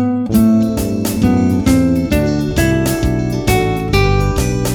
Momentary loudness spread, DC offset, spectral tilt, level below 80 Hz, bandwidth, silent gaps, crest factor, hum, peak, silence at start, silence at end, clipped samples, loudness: 4 LU; under 0.1%; -6 dB/octave; -24 dBFS; 19.5 kHz; none; 14 dB; none; 0 dBFS; 0 s; 0 s; under 0.1%; -14 LUFS